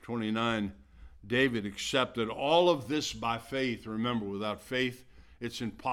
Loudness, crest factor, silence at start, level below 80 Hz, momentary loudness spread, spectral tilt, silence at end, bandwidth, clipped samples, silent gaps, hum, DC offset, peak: -31 LUFS; 20 dB; 0.05 s; -58 dBFS; 10 LU; -4.5 dB/octave; 0 s; 16 kHz; under 0.1%; none; none; under 0.1%; -12 dBFS